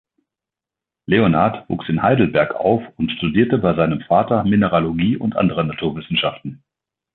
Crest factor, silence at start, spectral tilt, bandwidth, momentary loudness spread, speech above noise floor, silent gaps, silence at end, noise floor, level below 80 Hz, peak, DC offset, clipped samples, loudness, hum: 18 dB; 1.1 s; -10.5 dB/octave; 4.3 kHz; 8 LU; 70 dB; none; 0.6 s; -87 dBFS; -46 dBFS; 0 dBFS; under 0.1%; under 0.1%; -18 LUFS; none